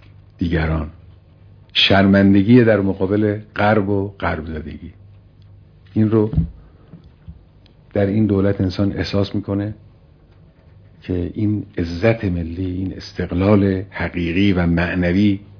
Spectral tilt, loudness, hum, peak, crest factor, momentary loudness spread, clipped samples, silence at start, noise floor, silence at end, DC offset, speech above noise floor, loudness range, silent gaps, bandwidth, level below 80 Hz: -8 dB/octave; -18 LUFS; none; 0 dBFS; 18 dB; 14 LU; under 0.1%; 0.4 s; -48 dBFS; 0.15 s; under 0.1%; 31 dB; 8 LU; none; 5.4 kHz; -38 dBFS